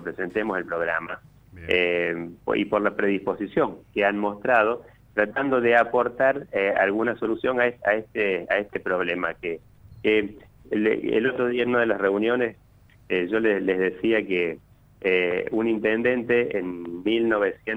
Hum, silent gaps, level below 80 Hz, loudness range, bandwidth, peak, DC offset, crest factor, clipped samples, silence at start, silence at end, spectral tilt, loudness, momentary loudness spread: none; none; -58 dBFS; 3 LU; 8 kHz; -6 dBFS; under 0.1%; 18 dB; under 0.1%; 0 s; 0 s; -7 dB/octave; -24 LUFS; 8 LU